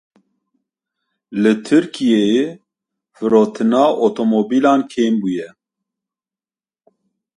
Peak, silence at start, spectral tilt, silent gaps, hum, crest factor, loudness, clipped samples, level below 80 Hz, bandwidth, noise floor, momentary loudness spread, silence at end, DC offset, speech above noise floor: 0 dBFS; 1.3 s; -6 dB/octave; none; none; 18 dB; -16 LUFS; under 0.1%; -64 dBFS; 11 kHz; under -90 dBFS; 10 LU; 1.9 s; under 0.1%; over 75 dB